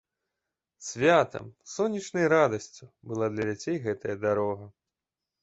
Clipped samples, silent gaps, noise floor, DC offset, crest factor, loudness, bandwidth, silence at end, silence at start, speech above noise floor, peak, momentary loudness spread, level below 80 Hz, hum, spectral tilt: under 0.1%; none; -89 dBFS; under 0.1%; 20 dB; -27 LUFS; 8.2 kHz; 0.75 s; 0.8 s; 61 dB; -8 dBFS; 17 LU; -64 dBFS; none; -5 dB/octave